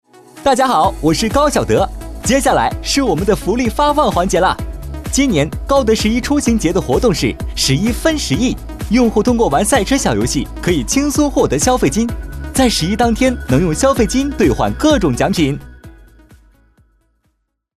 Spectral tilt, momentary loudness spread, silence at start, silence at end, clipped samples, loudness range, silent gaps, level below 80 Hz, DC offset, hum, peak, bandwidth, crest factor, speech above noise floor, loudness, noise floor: -4.5 dB/octave; 6 LU; 0.35 s; 1.85 s; under 0.1%; 1 LU; none; -28 dBFS; under 0.1%; none; -2 dBFS; 14 kHz; 14 dB; 51 dB; -14 LUFS; -65 dBFS